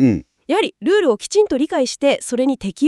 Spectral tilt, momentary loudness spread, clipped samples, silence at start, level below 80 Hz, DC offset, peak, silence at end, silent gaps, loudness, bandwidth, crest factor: -5 dB/octave; 4 LU; under 0.1%; 0 s; -50 dBFS; under 0.1%; -4 dBFS; 0 s; none; -18 LUFS; 12 kHz; 14 dB